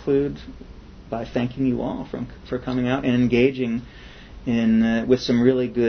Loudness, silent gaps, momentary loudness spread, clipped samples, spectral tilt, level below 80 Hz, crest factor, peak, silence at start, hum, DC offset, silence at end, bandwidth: -22 LUFS; none; 14 LU; under 0.1%; -7.5 dB/octave; -44 dBFS; 18 dB; -4 dBFS; 0 s; none; under 0.1%; 0 s; 6.6 kHz